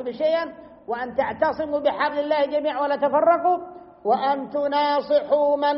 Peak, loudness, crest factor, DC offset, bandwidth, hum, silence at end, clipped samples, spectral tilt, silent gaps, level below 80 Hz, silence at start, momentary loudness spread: -8 dBFS; -22 LUFS; 14 dB; under 0.1%; 5.8 kHz; none; 0 s; under 0.1%; -2 dB/octave; none; -62 dBFS; 0 s; 10 LU